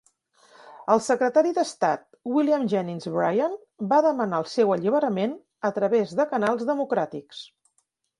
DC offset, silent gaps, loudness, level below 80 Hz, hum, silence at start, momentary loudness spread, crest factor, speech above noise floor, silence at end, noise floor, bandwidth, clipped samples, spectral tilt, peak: under 0.1%; none; -24 LUFS; -72 dBFS; none; 0.65 s; 9 LU; 20 dB; 49 dB; 0.75 s; -72 dBFS; 11.5 kHz; under 0.1%; -6 dB/octave; -4 dBFS